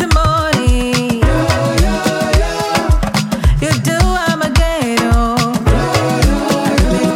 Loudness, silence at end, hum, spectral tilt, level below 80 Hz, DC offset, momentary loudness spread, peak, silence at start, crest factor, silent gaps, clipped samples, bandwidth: -14 LUFS; 0 s; none; -5.5 dB/octave; -18 dBFS; under 0.1%; 2 LU; -2 dBFS; 0 s; 12 dB; none; under 0.1%; 16.5 kHz